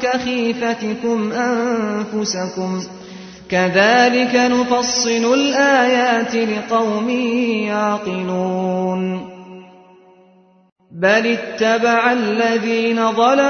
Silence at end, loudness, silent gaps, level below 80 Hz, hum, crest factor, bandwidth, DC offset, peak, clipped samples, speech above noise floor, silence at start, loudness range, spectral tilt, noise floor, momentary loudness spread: 0 s; -17 LUFS; 10.72-10.76 s; -58 dBFS; none; 16 dB; 6.6 kHz; under 0.1%; -2 dBFS; under 0.1%; 35 dB; 0 s; 7 LU; -4 dB/octave; -51 dBFS; 9 LU